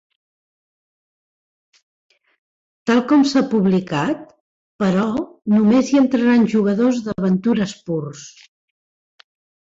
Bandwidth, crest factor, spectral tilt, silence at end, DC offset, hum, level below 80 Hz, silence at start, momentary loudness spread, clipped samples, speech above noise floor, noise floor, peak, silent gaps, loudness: 7.8 kHz; 14 dB; -6.5 dB/octave; 1.4 s; under 0.1%; none; -58 dBFS; 2.85 s; 11 LU; under 0.1%; over 73 dB; under -90 dBFS; -4 dBFS; 4.40-4.79 s; -18 LUFS